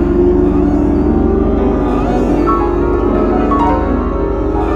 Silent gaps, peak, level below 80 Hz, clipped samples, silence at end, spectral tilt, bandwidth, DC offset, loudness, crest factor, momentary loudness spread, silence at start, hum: none; 0 dBFS; -20 dBFS; under 0.1%; 0 s; -9.5 dB/octave; 7.4 kHz; under 0.1%; -13 LUFS; 10 dB; 4 LU; 0 s; 50 Hz at -20 dBFS